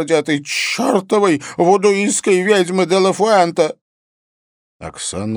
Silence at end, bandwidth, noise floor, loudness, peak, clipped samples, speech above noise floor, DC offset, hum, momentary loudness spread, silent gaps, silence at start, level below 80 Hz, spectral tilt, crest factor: 0 s; over 20 kHz; under -90 dBFS; -15 LUFS; 0 dBFS; under 0.1%; over 75 dB; under 0.1%; none; 10 LU; 3.81-4.80 s; 0 s; -56 dBFS; -4 dB/octave; 16 dB